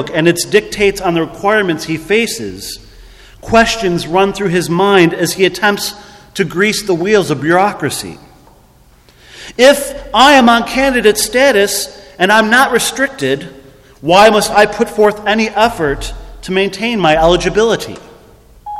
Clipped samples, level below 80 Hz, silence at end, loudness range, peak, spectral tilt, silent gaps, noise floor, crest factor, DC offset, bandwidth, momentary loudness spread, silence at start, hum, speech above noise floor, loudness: 0.3%; -36 dBFS; 0 s; 5 LU; 0 dBFS; -4 dB/octave; none; -45 dBFS; 12 dB; under 0.1%; 15.5 kHz; 14 LU; 0 s; none; 34 dB; -12 LUFS